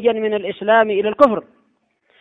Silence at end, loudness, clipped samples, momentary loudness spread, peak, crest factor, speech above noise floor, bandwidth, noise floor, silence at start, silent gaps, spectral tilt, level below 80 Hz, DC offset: 0.8 s; -17 LUFS; under 0.1%; 7 LU; 0 dBFS; 18 dB; 48 dB; 7.6 kHz; -64 dBFS; 0 s; none; -6.5 dB/octave; -58 dBFS; under 0.1%